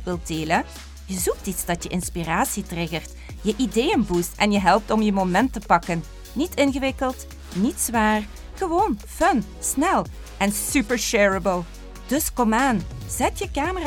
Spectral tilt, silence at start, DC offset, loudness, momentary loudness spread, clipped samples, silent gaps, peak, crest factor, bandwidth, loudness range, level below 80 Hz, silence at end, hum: -4 dB/octave; 0 s; under 0.1%; -23 LUFS; 10 LU; under 0.1%; none; -4 dBFS; 20 dB; 18 kHz; 3 LU; -38 dBFS; 0 s; none